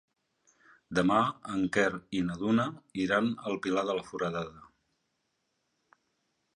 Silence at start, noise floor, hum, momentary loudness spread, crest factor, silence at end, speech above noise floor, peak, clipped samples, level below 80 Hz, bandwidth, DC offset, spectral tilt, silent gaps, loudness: 0.9 s; -79 dBFS; none; 8 LU; 20 dB; 1.9 s; 49 dB; -12 dBFS; under 0.1%; -64 dBFS; 11 kHz; under 0.1%; -6 dB/octave; none; -30 LUFS